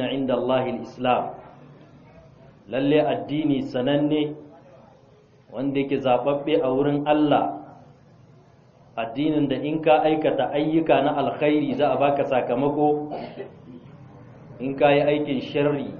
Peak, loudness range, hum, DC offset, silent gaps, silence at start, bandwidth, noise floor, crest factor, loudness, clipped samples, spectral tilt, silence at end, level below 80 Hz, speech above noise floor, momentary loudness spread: -4 dBFS; 4 LU; none; under 0.1%; none; 0 s; 5.8 kHz; -54 dBFS; 18 dB; -22 LUFS; under 0.1%; -5 dB/octave; 0 s; -58 dBFS; 32 dB; 13 LU